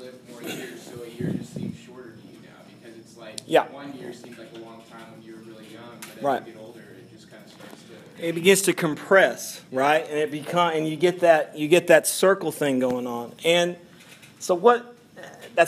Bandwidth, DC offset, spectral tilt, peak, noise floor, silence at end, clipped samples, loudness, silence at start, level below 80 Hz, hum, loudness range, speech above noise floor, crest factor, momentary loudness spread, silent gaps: 15.5 kHz; under 0.1%; -4 dB/octave; -2 dBFS; -49 dBFS; 0 s; under 0.1%; -22 LUFS; 0 s; -72 dBFS; none; 14 LU; 26 dB; 22 dB; 25 LU; none